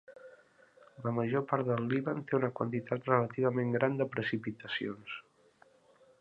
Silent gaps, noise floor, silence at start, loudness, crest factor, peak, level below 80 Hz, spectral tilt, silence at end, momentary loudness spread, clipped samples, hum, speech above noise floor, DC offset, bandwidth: none; -65 dBFS; 0.1 s; -33 LUFS; 24 dB; -12 dBFS; -74 dBFS; -9 dB/octave; 1 s; 10 LU; under 0.1%; none; 32 dB; under 0.1%; 5.6 kHz